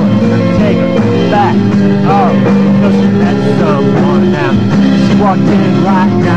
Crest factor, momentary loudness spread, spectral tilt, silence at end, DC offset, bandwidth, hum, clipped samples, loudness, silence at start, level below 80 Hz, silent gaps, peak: 8 dB; 2 LU; -8 dB/octave; 0 s; 3%; 7.8 kHz; none; under 0.1%; -9 LUFS; 0 s; -36 dBFS; none; 0 dBFS